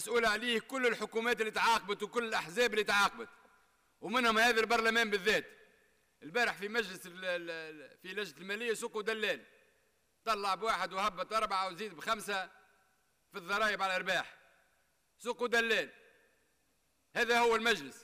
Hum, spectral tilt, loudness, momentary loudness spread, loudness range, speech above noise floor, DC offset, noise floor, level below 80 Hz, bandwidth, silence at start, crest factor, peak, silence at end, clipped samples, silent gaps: none; -2.5 dB/octave; -33 LUFS; 14 LU; 7 LU; 43 dB; under 0.1%; -76 dBFS; -68 dBFS; 15.5 kHz; 0 s; 14 dB; -20 dBFS; 0 s; under 0.1%; none